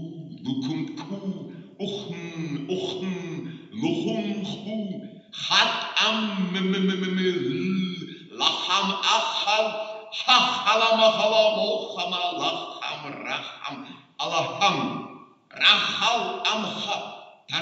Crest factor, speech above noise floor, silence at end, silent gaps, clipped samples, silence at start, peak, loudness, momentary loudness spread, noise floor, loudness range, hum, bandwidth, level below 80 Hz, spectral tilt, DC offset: 22 dB; 22 dB; 0 s; none; under 0.1%; 0 s; -4 dBFS; -24 LUFS; 17 LU; -46 dBFS; 9 LU; none; 8 kHz; -76 dBFS; -3.5 dB/octave; under 0.1%